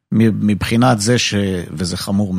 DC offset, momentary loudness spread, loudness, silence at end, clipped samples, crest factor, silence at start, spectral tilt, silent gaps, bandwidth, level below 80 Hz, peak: under 0.1%; 8 LU; -16 LUFS; 0 s; under 0.1%; 14 dB; 0.1 s; -5 dB/octave; none; 15.5 kHz; -42 dBFS; 0 dBFS